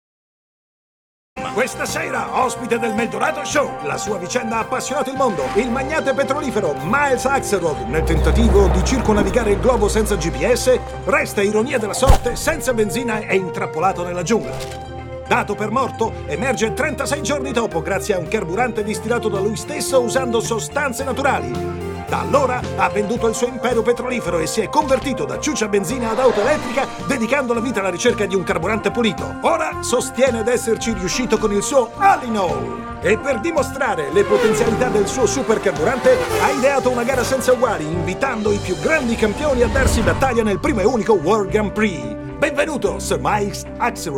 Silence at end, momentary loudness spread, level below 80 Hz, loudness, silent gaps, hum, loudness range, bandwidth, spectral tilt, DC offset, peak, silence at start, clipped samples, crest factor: 0 s; 6 LU; -30 dBFS; -19 LUFS; none; none; 4 LU; 17 kHz; -4.5 dB/octave; under 0.1%; 0 dBFS; 1.35 s; under 0.1%; 18 dB